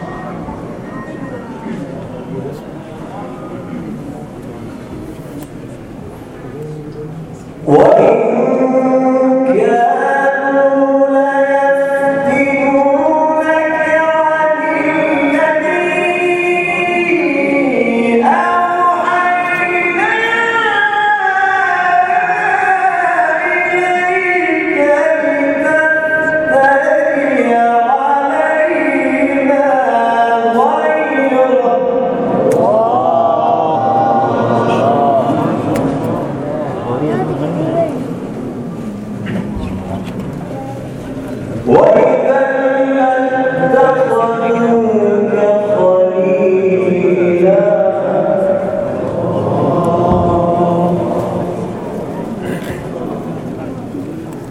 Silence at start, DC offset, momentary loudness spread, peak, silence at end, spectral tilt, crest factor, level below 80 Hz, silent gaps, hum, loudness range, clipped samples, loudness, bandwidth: 0 s; under 0.1%; 15 LU; 0 dBFS; 0 s; -7 dB/octave; 12 dB; -44 dBFS; none; none; 11 LU; under 0.1%; -12 LUFS; 12.5 kHz